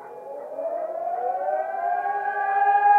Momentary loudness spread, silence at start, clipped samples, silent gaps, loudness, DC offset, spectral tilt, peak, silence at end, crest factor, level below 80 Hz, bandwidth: 13 LU; 0 s; under 0.1%; none; -25 LUFS; under 0.1%; -4.5 dB/octave; -8 dBFS; 0 s; 14 dB; under -90 dBFS; 3.5 kHz